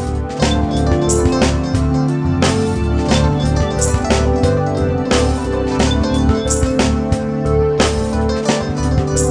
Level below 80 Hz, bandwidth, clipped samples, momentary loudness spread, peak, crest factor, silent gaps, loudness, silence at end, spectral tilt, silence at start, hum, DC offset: -22 dBFS; 10 kHz; under 0.1%; 3 LU; 0 dBFS; 14 dB; none; -16 LUFS; 0 s; -5.5 dB/octave; 0 s; none; under 0.1%